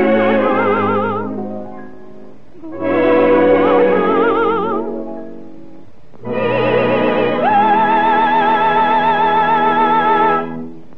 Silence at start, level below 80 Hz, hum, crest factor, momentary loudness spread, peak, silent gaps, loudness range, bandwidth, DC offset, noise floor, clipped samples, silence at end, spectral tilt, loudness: 0 s; -56 dBFS; none; 12 dB; 15 LU; -2 dBFS; none; 5 LU; 6 kHz; 3%; -42 dBFS; under 0.1%; 0.15 s; -8 dB/octave; -14 LUFS